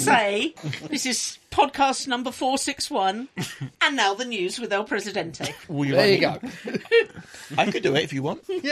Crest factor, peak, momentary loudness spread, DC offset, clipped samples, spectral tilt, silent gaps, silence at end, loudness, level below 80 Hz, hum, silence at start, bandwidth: 20 dB; -4 dBFS; 12 LU; under 0.1%; under 0.1%; -3.5 dB/octave; none; 0 s; -24 LUFS; -58 dBFS; none; 0 s; 14 kHz